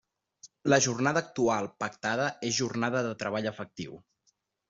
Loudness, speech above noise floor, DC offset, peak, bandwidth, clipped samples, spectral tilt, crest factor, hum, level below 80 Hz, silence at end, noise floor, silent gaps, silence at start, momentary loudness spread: -29 LUFS; 45 dB; under 0.1%; -8 dBFS; 8 kHz; under 0.1%; -4 dB/octave; 22 dB; none; -68 dBFS; 0.75 s; -74 dBFS; none; 0.45 s; 13 LU